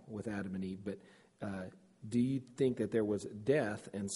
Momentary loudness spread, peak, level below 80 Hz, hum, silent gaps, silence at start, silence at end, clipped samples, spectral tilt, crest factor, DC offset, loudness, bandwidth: 13 LU; -18 dBFS; -70 dBFS; none; none; 0 s; 0 s; under 0.1%; -6.5 dB/octave; 18 dB; under 0.1%; -37 LUFS; 11.5 kHz